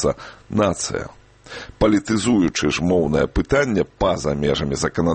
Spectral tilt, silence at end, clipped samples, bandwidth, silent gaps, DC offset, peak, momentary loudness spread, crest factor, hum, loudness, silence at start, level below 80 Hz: -5 dB/octave; 0 s; under 0.1%; 8.8 kHz; none; under 0.1%; -4 dBFS; 12 LU; 16 dB; none; -20 LUFS; 0 s; -36 dBFS